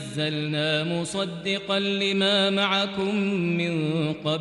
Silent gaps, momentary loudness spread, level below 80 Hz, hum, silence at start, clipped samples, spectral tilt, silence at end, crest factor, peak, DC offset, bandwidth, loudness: none; 7 LU; -64 dBFS; none; 0 s; under 0.1%; -5 dB/octave; 0 s; 16 dB; -10 dBFS; under 0.1%; 11.5 kHz; -24 LUFS